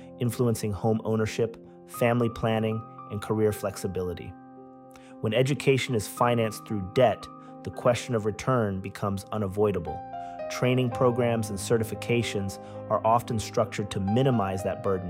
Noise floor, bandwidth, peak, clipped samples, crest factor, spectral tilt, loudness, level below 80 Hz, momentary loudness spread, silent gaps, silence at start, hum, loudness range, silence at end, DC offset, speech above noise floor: -48 dBFS; 16 kHz; -10 dBFS; under 0.1%; 18 dB; -6 dB/octave; -27 LUFS; -56 dBFS; 12 LU; none; 0 s; none; 3 LU; 0 s; under 0.1%; 21 dB